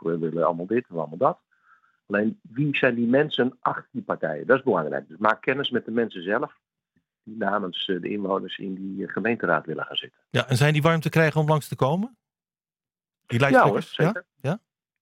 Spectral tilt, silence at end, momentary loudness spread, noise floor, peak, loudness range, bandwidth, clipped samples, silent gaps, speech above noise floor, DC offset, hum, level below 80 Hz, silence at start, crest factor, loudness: -6.5 dB/octave; 0.45 s; 10 LU; under -90 dBFS; -4 dBFS; 5 LU; 16 kHz; under 0.1%; none; over 66 dB; under 0.1%; none; -66 dBFS; 0.05 s; 22 dB; -24 LUFS